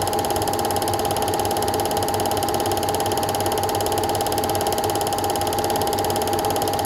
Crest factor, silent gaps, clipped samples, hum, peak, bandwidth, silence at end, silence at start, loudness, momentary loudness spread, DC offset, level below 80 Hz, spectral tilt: 16 dB; none; under 0.1%; none; -6 dBFS; 17 kHz; 0 s; 0 s; -22 LUFS; 0 LU; under 0.1%; -44 dBFS; -3.5 dB/octave